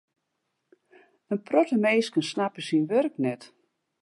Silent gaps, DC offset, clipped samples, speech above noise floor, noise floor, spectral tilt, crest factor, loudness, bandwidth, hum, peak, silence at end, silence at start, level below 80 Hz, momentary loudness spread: none; under 0.1%; under 0.1%; 54 dB; -79 dBFS; -5.5 dB/octave; 18 dB; -26 LUFS; 11.5 kHz; none; -8 dBFS; 0.55 s; 1.3 s; -82 dBFS; 10 LU